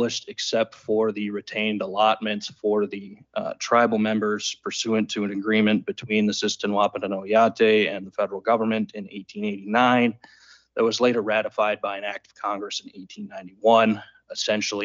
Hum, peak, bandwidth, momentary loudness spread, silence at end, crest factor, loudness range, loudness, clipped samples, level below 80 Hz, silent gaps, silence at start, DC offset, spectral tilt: none; -6 dBFS; 7.8 kHz; 13 LU; 0 s; 18 dB; 3 LU; -23 LUFS; under 0.1%; -72 dBFS; none; 0 s; under 0.1%; -4 dB/octave